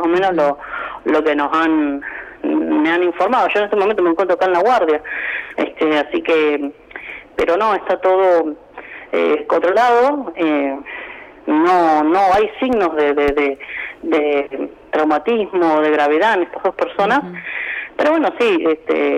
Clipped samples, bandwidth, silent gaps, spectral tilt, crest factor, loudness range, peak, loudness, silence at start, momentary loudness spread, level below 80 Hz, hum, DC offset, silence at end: under 0.1%; 9.8 kHz; none; -5.5 dB/octave; 10 dB; 2 LU; -6 dBFS; -16 LUFS; 0 s; 12 LU; -50 dBFS; none; under 0.1%; 0 s